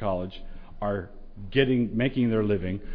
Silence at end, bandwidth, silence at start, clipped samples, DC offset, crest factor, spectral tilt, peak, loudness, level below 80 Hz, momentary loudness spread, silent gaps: 0 s; 5.2 kHz; 0 s; under 0.1%; under 0.1%; 18 dB; -10 dB/octave; -8 dBFS; -27 LUFS; -40 dBFS; 18 LU; none